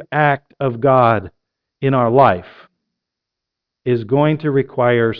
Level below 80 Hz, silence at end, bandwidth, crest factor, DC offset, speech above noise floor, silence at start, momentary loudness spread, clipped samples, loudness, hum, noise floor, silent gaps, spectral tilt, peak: -52 dBFS; 0 s; 5.4 kHz; 16 dB; under 0.1%; 66 dB; 0 s; 10 LU; under 0.1%; -16 LUFS; none; -81 dBFS; none; -10.5 dB/octave; 0 dBFS